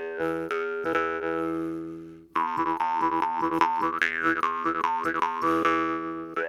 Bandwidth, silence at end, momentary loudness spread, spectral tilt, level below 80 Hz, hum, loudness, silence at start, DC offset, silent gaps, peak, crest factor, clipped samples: 15 kHz; 0 s; 8 LU; -5.5 dB/octave; -62 dBFS; none; -27 LUFS; 0 s; under 0.1%; none; -6 dBFS; 22 dB; under 0.1%